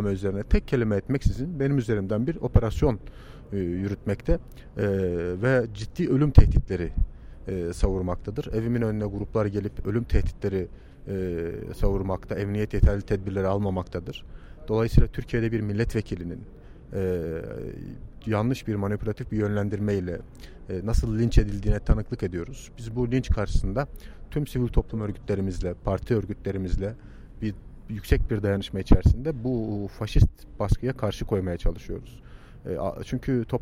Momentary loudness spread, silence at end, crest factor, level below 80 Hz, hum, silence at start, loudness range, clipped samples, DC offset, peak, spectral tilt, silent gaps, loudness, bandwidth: 13 LU; 0 s; 24 dB; -30 dBFS; none; 0 s; 5 LU; under 0.1%; under 0.1%; -2 dBFS; -8 dB/octave; none; -27 LUFS; 14.5 kHz